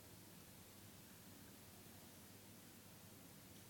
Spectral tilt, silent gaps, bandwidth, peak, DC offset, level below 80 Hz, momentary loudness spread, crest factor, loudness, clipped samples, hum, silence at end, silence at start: -3.5 dB/octave; none; 18 kHz; -48 dBFS; under 0.1%; -80 dBFS; 1 LU; 14 dB; -60 LUFS; under 0.1%; 50 Hz at -70 dBFS; 0 s; 0 s